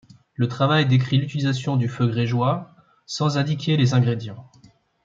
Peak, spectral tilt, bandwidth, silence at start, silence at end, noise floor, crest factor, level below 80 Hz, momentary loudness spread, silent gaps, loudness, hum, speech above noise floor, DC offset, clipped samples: -6 dBFS; -6.5 dB/octave; 7.6 kHz; 0.4 s; 0.6 s; -54 dBFS; 16 dB; -62 dBFS; 11 LU; none; -22 LUFS; none; 34 dB; under 0.1%; under 0.1%